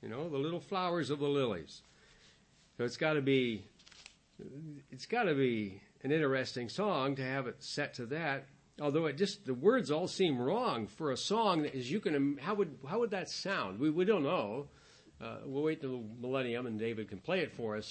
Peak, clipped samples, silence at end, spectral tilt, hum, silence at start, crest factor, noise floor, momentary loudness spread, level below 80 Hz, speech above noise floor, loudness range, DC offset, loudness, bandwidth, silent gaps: -16 dBFS; under 0.1%; 0 s; -5.5 dB/octave; none; 0 s; 20 dB; -66 dBFS; 13 LU; -74 dBFS; 31 dB; 5 LU; under 0.1%; -35 LUFS; 8.4 kHz; none